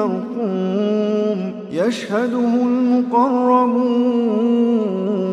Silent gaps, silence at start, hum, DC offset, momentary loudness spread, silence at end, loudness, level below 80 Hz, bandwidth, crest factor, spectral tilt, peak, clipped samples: none; 0 s; none; under 0.1%; 6 LU; 0 s; -18 LUFS; -72 dBFS; 8.6 kHz; 14 dB; -7.5 dB/octave; -2 dBFS; under 0.1%